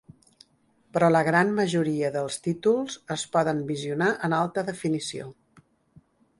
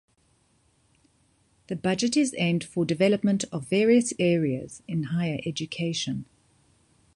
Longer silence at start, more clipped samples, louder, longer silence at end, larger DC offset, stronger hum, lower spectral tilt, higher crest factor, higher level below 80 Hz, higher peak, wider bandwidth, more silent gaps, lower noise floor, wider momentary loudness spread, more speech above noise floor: second, 0.95 s vs 1.7 s; neither; about the same, -25 LUFS vs -26 LUFS; first, 1.1 s vs 0.9 s; neither; neither; about the same, -5.5 dB/octave vs -5.5 dB/octave; about the same, 18 dB vs 20 dB; about the same, -66 dBFS vs -62 dBFS; about the same, -8 dBFS vs -8 dBFS; about the same, 11.5 kHz vs 11.5 kHz; neither; about the same, -65 dBFS vs -66 dBFS; about the same, 11 LU vs 10 LU; about the same, 40 dB vs 41 dB